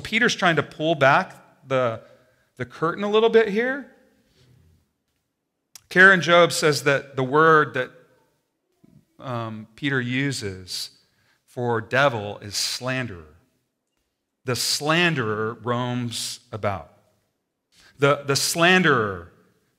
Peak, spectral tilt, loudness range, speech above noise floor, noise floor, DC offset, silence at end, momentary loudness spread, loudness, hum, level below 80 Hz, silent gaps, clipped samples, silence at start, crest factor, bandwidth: -2 dBFS; -4 dB/octave; 9 LU; 56 dB; -78 dBFS; under 0.1%; 0.55 s; 16 LU; -21 LUFS; none; -66 dBFS; none; under 0.1%; 0 s; 22 dB; 16 kHz